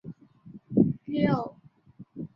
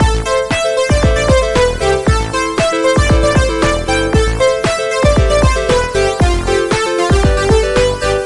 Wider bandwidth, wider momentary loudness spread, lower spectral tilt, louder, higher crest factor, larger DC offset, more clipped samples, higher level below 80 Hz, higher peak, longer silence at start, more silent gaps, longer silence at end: second, 5.8 kHz vs 11.5 kHz; first, 20 LU vs 3 LU; first, -10.5 dB/octave vs -5 dB/octave; second, -27 LUFS vs -13 LUFS; first, 22 dB vs 12 dB; second, under 0.1% vs 0.2%; neither; second, -60 dBFS vs -18 dBFS; second, -8 dBFS vs -2 dBFS; about the same, 0.05 s vs 0 s; neither; about the same, 0.1 s vs 0 s